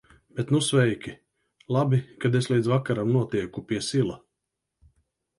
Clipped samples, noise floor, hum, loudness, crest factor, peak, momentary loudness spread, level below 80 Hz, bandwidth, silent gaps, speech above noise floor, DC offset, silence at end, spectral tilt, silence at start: under 0.1%; -83 dBFS; none; -25 LUFS; 18 dB; -8 dBFS; 12 LU; -60 dBFS; 11.5 kHz; none; 59 dB; under 0.1%; 1.2 s; -6 dB/octave; 0.35 s